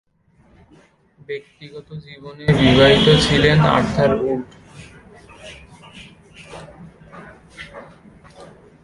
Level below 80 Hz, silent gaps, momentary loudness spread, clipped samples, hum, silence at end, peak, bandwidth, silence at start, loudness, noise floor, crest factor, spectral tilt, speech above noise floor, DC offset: -40 dBFS; none; 27 LU; under 0.1%; none; 0.4 s; 0 dBFS; 11.5 kHz; 1.3 s; -15 LUFS; -56 dBFS; 20 dB; -6 dB/octave; 40 dB; under 0.1%